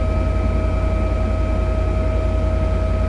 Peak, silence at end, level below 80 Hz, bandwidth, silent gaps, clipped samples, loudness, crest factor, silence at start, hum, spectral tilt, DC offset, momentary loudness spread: -8 dBFS; 0 s; -20 dBFS; 7.6 kHz; none; under 0.1%; -21 LUFS; 10 dB; 0 s; none; -8.5 dB/octave; under 0.1%; 1 LU